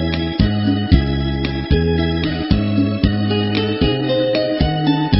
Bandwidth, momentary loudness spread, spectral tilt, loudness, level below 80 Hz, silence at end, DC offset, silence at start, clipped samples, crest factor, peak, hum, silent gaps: 5.8 kHz; 4 LU; -10 dB/octave; -17 LUFS; -26 dBFS; 0 s; under 0.1%; 0 s; under 0.1%; 16 dB; 0 dBFS; none; none